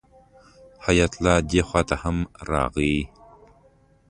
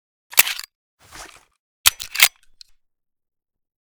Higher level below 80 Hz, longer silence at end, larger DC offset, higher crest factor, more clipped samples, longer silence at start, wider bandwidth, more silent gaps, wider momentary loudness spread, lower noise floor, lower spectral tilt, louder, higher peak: first, -36 dBFS vs -56 dBFS; second, 1 s vs 1.55 s; neither; about the same, 20 dB vs 24 dB; neither; first, 0.8 s vs 0.35 s; second, 11 kHz vs over 20 kHz; second, none vs 0.75-0.98 s, 1.59-1.84 s; second, 8 LU vs 20 LU; first, -57 dBFS vs -50 dBFS; first, -5.5 dB/octave vs 3 dB/octave; second, -23 LUFS vs -17 LUFS; second, -4 dBFS vs 0 dBFS